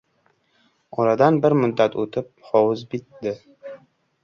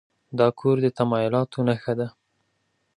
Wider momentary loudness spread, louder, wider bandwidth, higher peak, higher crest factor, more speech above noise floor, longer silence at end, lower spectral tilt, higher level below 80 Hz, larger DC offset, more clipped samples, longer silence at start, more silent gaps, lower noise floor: first, 19 LU vs 8 LU; first, -21 LUFS vs -24 LUFS; second, 6.8 kHz vs 10.5 kHz; about the same, -4 dBFS vs -6 dBFS; about the same, 20 dB vs 18 dB; second, 45 dB vs 50 dB; second, 0.5 s vs 0.9 s; about the same, -8 dB/octave vs -8.5 dB/octave; about the same, -64 dBFS vs -64 dBFS; neither; neither; first, 0.95 s vs 0.3 s; neither; second, -65 dBFS vs -72 dBFS